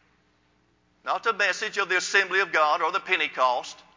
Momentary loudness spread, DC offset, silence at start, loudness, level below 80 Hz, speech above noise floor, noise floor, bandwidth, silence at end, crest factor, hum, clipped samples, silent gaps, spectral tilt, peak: 6 LU; under 0.1%; 1.05 s; -24 LUFS; -76 dBFS; 41 dB; -66 dBFS; 7.6 kHz; 0.2 s; 20 dB; 60 Hz at -70 dBFS; under 0.1%; none; -1 dB/octave; -8 dBFS